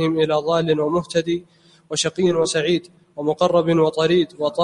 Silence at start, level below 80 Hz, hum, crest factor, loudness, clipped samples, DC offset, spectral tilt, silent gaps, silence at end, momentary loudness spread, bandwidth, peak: 0 s; -56 dBFS; none; 16 dB; -20 LUFS; under 0.1%; under 0.1%; -5 dB/octave; none; 0 s; 9 LU; 11.5 kHz; -4 dBFS